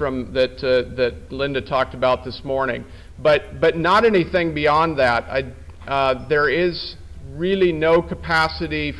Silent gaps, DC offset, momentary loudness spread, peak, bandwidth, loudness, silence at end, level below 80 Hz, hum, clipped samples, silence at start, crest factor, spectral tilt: none; under 0.1%; 10 LU; -8 dBFS; 11 kHz; -20 LUFS; 0 s; -40 dBFS; none; under 0.1%; 0 s; 12 dB; -6.5 dB/octave